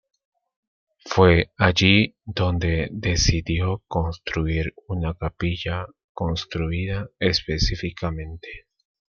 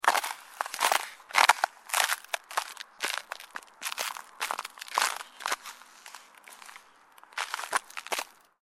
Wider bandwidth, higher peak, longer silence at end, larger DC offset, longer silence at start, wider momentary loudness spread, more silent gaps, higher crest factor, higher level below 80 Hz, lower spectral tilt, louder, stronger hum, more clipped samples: second, 7.2 kHz vs 16.5 kHz; about the same, -2 dBFS vs -2 dBFS; first, 0.55 s vs 0.4 s; neither; first, 1.05 s vs 0.05 s; second, 13 LU vs 21 LU; first, 6.04-6.15 s vs none; second, 22 dB vs 30 dB; first, -36 dBFS vs -82 dBFS; first, -5 dB/octave vs 2.5 dB/octave; first, -23 LUFS vs -30 LUFS; neither; neither